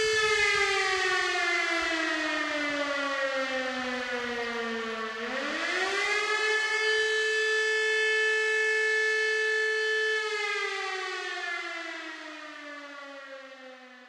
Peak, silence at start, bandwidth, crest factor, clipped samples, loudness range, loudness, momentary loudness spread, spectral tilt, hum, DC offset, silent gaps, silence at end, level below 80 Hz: -14 dBFS; 0 s; 13 kHz; 16 dB; under 0.1%; 6 LU; -27 LUFS; 16 LU; -0.5 dB/octave; none; under 0.1%; none; 0 s; -66 dBFS